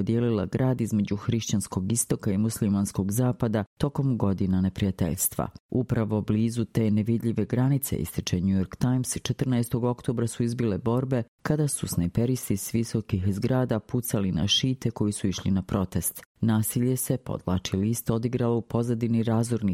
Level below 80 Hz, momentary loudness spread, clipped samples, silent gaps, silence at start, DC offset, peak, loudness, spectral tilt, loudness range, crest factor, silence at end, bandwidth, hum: -50 dBFS; 4 LU; under 0.1%; 3.67-3.77 s, 5.60-5.69 s, 11.28-11.38 s, 16.25-16.35 s; 0 s; under 0.1%; -10 dBFS; -27 LUFS; -5.5 dB/octave; 1 LU; 16 dB; 0 s; 16.5 kHz; none